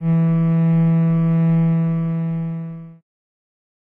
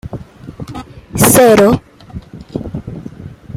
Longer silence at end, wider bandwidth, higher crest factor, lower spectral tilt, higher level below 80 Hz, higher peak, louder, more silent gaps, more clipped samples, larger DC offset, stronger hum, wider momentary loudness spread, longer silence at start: first, 1.05 s vs 0.05 s; second, 3 kHz vs 17 kHz; about the same, 10 dB vs 14 dB; first, -12.5 dB/octave vs -4.5 dB/octave; second, -58 dBFS vs -38 dBFS; second, -10 dBFS vs 0 dBFS; second, -18 LUFS vs -9 LUFS; neither; neither; neither; neither; second, 12 LU vs 25 LU; about the same, 0 s vs 0.05 s